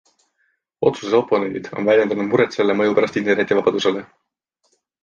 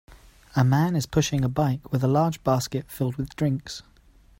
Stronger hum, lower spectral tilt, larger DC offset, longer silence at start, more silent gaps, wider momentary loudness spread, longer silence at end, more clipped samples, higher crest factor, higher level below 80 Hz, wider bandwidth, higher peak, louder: neither; about the same, -5.5 dB/octave vs -6.5 dB/octave; neither; first, 0.8 s vs 0.1 s; neither; second, 5 LU vs 9 LU; first, 0.95 s vs 0.6 s; neither; about the same, 16 dB vs 16 dB; second, -62 dBFS vs -48 dBFS; second, 7.4 kHz vs 16.5 kHz; first, -2 dBFS vs -8 dBFS; first, -19 LUFS vs -25 LUFS